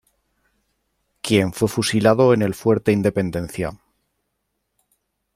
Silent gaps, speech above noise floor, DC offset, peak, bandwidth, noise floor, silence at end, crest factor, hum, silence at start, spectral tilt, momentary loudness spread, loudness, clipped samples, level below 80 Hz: none; 56 dB; under 0.1%; -2 dBFS; 16 kHz; -75 dBFS; 1.6 s; 20 dB; none; 1.25 s; -6 dB/octave; 12 LU; -19 LUFS; under 0.1%; -52 dBFS